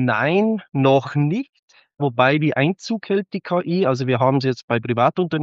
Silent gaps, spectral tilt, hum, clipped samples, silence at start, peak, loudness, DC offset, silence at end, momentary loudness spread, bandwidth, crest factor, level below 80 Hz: 1.59-1.68 s, 4.63-4.68 s; -5.5 dB/octave; none; under 0.1%; 0 s; -2 dBFS; -20 LUFS; under 0.1%; 0 s; 7 LU; 7.6 kHz; 18 dB; -66 dBFS